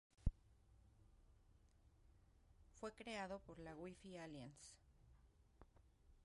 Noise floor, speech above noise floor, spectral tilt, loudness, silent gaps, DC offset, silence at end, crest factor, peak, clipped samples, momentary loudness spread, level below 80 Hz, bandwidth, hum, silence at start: -73 dBFS; 18 dB; -5.5 dB/octave; -54 LUFS; none; under 0.1%; 0 s; 30 dB; -24 dBFS; under 0.1%; 11 LU; -60 dBFS; 11.5 kHz; none; 0.2 s